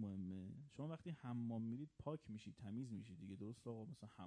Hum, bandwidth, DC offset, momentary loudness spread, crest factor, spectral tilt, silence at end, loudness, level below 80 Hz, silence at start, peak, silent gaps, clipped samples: none; 10 kHz; under 0.1%; 8 LU; 16 dB; -8 dB/octave; 0 s; -51 LUFS; -78 dBFS; 0 s; -34 dBFS; none; under 0.1%